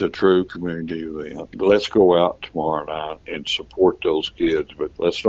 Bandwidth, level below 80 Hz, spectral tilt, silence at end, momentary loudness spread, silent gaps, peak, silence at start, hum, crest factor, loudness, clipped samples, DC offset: 7.8 kHz; -50 dBFS; -6 dB/octave; 0 s; 13 LU; none; -2 dBFS; 0 s; none; 18 dB; -21 LUFS; under 0.1%; under 0.1%